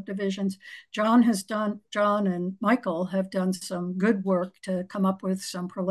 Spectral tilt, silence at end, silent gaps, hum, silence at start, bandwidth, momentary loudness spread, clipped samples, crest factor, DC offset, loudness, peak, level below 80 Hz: -6 dB/octave; 0 s; none; none; 0 s; 12.5 kHz; 9 LU; under 0.1%; 16 dB; under 0.1%; -27 LUFS; -10 dBFS; -74 dBFS